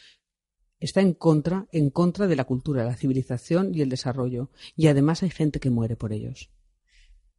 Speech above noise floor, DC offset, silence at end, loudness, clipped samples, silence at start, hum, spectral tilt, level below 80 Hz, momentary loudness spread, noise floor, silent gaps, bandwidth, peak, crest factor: 52 dB; under 0.1%; 0.95 s; -24 LUFS; under 0.1%; 0.8 s; none; -7.5 dB/octave; -50 dBFS; 11 LU; -76 dBFS; none; 11.5 kHz; -6 dBFS; 18 dB